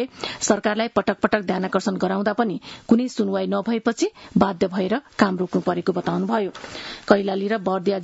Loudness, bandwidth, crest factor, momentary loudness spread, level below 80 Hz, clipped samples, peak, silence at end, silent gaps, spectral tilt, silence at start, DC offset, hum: -22 LUFS; 8 kHz; 22 dB; 6 LU; -58 dBFS; under 0.1%; 0 dBFS; 0 s; none; -5.5 dB/octave; 0 s; under 0.1%; none